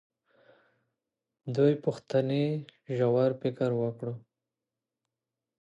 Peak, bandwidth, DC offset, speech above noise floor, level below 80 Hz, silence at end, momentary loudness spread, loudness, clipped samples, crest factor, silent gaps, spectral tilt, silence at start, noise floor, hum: -12 dBFS; 8.4 kHz; under 0.1%; 61 dB; -76 dBFS; 1.4 s; 13 LU; -29 LUFS; under 0.1%; 18 dB; none; -8.5 dB/octave; 1.45 s; -89 dBFS; none